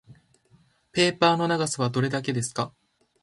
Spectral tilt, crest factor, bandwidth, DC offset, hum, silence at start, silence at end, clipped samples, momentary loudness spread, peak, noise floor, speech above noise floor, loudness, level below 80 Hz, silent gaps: -4.5 dB/octave; 22 dB; 11.5 kHz; under 0.1%; none; 0.1 s; 0.55 s; under 0.1%; 11 LU; -4 dBFS; -61 dBFS; 37 dB; -25 LUFS; -64 dBFS; none